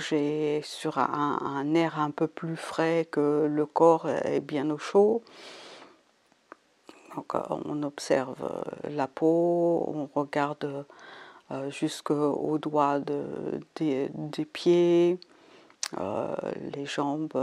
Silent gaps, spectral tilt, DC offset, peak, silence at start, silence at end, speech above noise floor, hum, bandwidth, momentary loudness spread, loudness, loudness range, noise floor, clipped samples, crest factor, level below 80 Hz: none; -6 dB/octave; under 0.1%; -8 dBFS; 0 s; 0 s; 38 dB; none; 12 kHz; 13 LU; -28 LUFS; 5 LU; -65 dBFS; under 0.1%; 20 dB; -76 dBFS